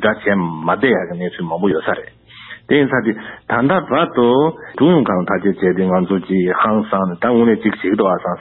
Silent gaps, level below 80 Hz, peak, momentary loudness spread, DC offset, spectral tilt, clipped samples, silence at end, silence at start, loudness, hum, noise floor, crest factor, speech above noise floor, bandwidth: none; -50 dBFS; 0 dBFS; 9 LU; under 0.1%; -12 dB/octave; under 0.1%; 0 s; 0 s; -16 LUFS; none; -38 dBFS; 14 dB; 22 dB; 4.1 kHz